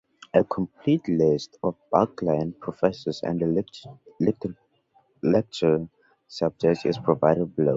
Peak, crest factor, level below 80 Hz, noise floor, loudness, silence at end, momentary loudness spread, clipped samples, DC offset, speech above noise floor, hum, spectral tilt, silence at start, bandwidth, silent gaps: -2 dBFS; 22 dB; -58 dBFS; -64 dBFS; -25 LUFS; 0 s; 9 LU; under 0.1%; under 0.1%; 40 dB; none; -7.5 dB/octave; 0.35 s; 7.8 kHz; none